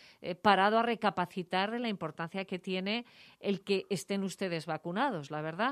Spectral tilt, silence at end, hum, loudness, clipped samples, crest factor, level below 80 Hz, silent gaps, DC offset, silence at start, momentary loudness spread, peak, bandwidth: -5 dB/octave; 0 s; none; -33 LUFS; under 0.1%; 22 dB; -78 dBFS; none; under 0.1%; 0.2 s; 11 LU; -10 dBFS; 14.5 kHz